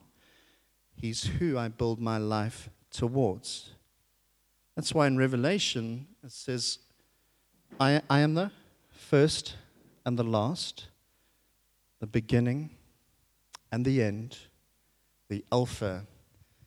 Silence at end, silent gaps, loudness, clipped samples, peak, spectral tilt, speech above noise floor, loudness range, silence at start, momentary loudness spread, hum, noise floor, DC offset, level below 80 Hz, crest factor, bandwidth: 0.6 s; none; -30 LUFS; under 0.1%; -10 dBFS; -5.5 dB/octave; 42 dB; 5 LU; 1 s; 17 LU; none; -71 dBFS; under 0.1%; -58 dBFS; 22 dB; 13 kHz